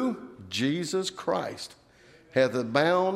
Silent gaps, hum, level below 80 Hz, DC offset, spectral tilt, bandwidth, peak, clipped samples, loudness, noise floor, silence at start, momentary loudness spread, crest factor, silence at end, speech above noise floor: none; none; -70 dBFS; under 0.1%; -4.5 dB/octave; 14 kHz; -8 dBFS; under 0.1%; -28 LUFS; -56 dBFS; 0 s; 14 LU; 20 dB; 0 s; 30 dB